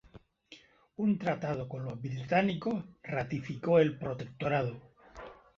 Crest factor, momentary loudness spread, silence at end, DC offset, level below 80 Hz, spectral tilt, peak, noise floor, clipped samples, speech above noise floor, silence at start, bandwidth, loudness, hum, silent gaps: 20 dB; 18 LU; 0.25 s; under 0.1%; -64 dBFS; -8 dB/octave; -14 dBFS; -58 dBFS; under 0.1%; 27 dB; 0.15 s; 7.2 kHz; -32 LUFS; none; none